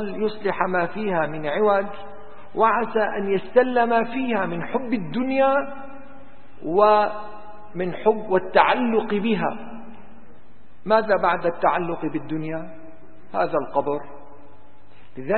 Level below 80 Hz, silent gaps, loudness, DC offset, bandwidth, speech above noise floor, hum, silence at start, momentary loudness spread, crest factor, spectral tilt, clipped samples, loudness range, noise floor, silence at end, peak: -56 dBFS; none; -22 LUFS; 2%; 4.4 kHz; 31 dB; none; 0 s; 18 LU; 24 dB; -10.5 dB/octave; under 0.1%; 3 LU; -53 dBFS; 0 s; 0 dBFS